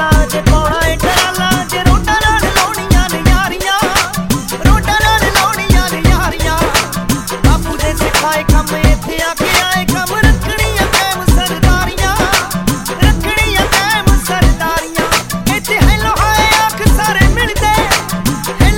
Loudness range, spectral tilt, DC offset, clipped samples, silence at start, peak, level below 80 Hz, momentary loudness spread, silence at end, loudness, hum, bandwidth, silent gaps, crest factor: 1 LU; -4 dB/octave; under 0.1%; under 0.1%; 0 s; 0 dBFS; -16 dBFS; 5 LU; 0 s; -12 LUFS; none; 17.5 kHz; none; 12 dB